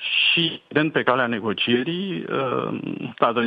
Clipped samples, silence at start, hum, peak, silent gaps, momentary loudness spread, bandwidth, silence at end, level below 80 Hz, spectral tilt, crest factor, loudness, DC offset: under 0.1%; 0 s; none; -2 dBFS; none; 10 LU; 5.2 kHz; 0 s; -68 dBFS; -7.5 dB/octave; 20 dB; -22 LUFS; under 0.1%